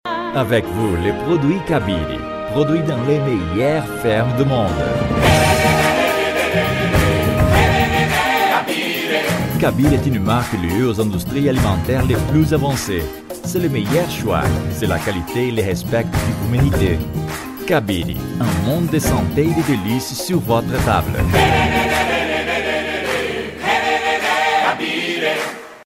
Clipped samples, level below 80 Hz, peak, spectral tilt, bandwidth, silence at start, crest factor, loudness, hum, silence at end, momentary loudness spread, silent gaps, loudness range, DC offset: under 0.1%; -32 dBFS; -2 dBFS; -5.5 dB/octave; 16.5 kHz; 0.05 s; 16 dB; -17 LUFS; none; 0 s; 6 LU; none; 4 LU; under 0.1%